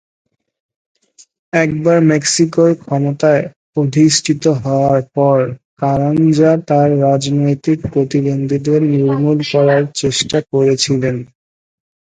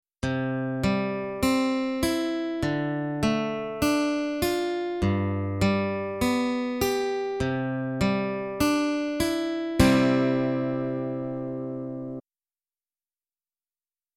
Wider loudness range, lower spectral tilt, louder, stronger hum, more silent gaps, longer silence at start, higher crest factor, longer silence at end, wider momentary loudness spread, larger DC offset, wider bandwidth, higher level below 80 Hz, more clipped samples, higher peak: second, 1 LU vs 4 LU; about the same, -5.5 dB/octave vs -6 dB/octave; first, -14 LUFS vs -26 LUFS; neither; first, 3.56-3.73 s, 5.65-5.77 s vs none; first, 1.55 s vs 0.25 s; second, 14 dB vs 20 dB; second, 0.9 s vs 1.95 s; about the same, 6 LU vs 7 LU; neither; second, 9.6 kHz vs 16.5 kHz; about the same, -50 dBFS vs -46 dBFS; neither; first, 0 dBFS vs -6 dBFS